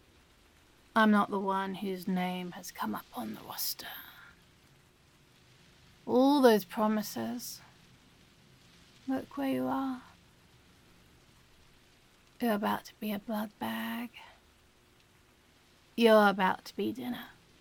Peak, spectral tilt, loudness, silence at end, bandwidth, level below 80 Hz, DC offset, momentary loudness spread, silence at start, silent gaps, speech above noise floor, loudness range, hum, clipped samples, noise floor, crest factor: -10 dBFS; -5 dB/octave; -31 LUFS; 0.3 s; 17.5 kHz; -70 dBFS; under 0.1%; 19 LU; 0.95 s; none; 33 dB; 9 LU; none; under 0.1%; -64 dBFS; 22 dB